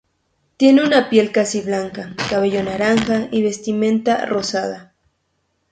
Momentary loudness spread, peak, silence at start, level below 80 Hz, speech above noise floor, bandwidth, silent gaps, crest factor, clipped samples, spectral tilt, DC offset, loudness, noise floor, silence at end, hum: 10 LU; 0 dBFS; 0.6 s; -54 dBFS; 52 dB; 9.2 kHz; none; 18 dB; under 0.1%; -4.5 dB/octave; under 0.1%; -17 LUFS; -68 dBFS; 0.9 s; none